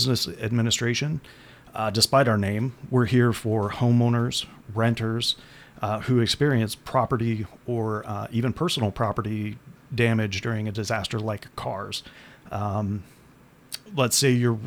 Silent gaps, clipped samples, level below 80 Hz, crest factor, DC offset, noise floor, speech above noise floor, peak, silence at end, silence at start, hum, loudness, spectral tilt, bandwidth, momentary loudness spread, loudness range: none; under 0.1%; -54 dBFS; 20 dB; under 0.1%; -53 dBFS; 29 dB; -4 dBFS; 0 s; 0 s; none; -25 LUFS; -5 dB/octave; 19 kHz; 12 LU; 6 LU